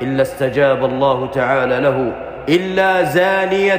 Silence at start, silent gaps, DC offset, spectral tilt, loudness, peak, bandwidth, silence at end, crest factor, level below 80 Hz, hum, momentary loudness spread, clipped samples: 0 s; none; under 0.1%; -6 dB/octave; -16 LUFS; -4 dBFS; 15.5 kHz; 0 s; 12 dB; -46 dBFS; none; 4 LU; under 0.1%